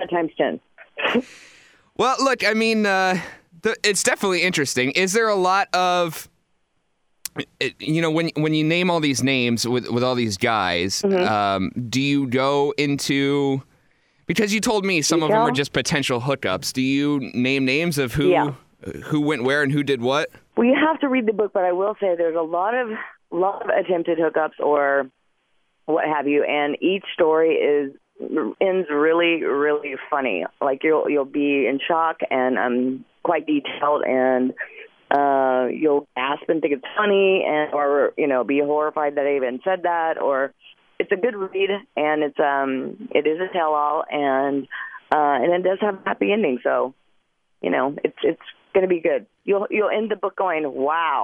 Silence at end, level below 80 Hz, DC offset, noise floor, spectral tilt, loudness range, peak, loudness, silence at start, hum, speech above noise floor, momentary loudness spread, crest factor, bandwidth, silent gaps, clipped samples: 0 s; -58 dBFS; under 0.1%; -68 dBFS; -4.5 dB/octave; 3 LU; -4 dBFS; -21 LUFS; 0 s; none; 47 dB; 7 LU; 18 dB; 16 kHz; none; under 0.1%